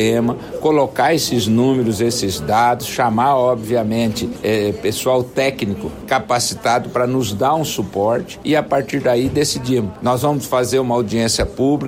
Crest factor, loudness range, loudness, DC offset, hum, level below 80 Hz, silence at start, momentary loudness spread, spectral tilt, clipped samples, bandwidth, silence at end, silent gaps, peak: 12 dB; 2 LU; -17 LUFS; under 0.1%; none; -42 dBFS; 0 s; 5 LU; -5 dB/octave; under 0.1%; 16.5 kHz; 0 s; none; -4 dBFS